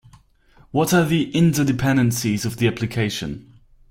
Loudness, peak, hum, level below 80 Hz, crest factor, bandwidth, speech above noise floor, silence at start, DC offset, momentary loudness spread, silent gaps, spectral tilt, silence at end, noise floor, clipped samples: -20 LUFS; -6 dBFS; none; -48 dBFS; 16 dB; 16.5 kHz; 34 dB; 0.75 s; under 0.1%; 9 LU; none; -5.5 dB/octave; 0.5 s; -53 dBFS; under 0.1%